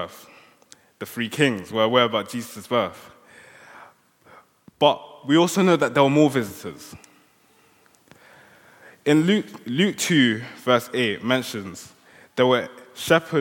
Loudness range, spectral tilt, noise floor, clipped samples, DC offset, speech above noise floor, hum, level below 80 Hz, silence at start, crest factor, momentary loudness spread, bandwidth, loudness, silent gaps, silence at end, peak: 5 LU; -5 dB/octave; -58 dBFS; under 0.1%; under 0.1%; 37 dB; none; -70 dBFS; 0 s; 22 dB; 16 LU; 17.5 kHz; -21 LUFS; none; 0 s; -2 dBFS